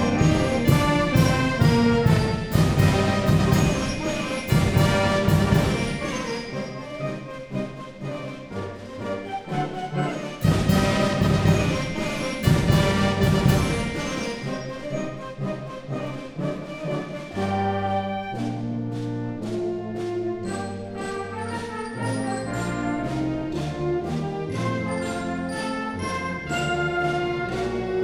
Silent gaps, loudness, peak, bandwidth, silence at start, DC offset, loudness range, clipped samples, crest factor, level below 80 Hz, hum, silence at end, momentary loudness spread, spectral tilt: none; -24 LUFS; -4 dBFS; over 20 kHz; 0 s; under 0.1%; 9 LU; under 0.1%; 18 dB; -38 dBFS; none; 0 s; 12 LU; -6 dB/octave